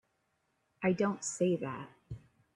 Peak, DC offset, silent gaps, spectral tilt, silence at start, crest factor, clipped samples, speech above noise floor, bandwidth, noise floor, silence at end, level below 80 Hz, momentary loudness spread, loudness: -18 dBFS; under 0.1%; none; -5.5 dB/octave; 0.8 s; 18 dB; under 0.1%; 46 dB; 11.5 kHz; -79 dBFS; 0.4 s; -66 dBFS; 19 LU; -33 LUFS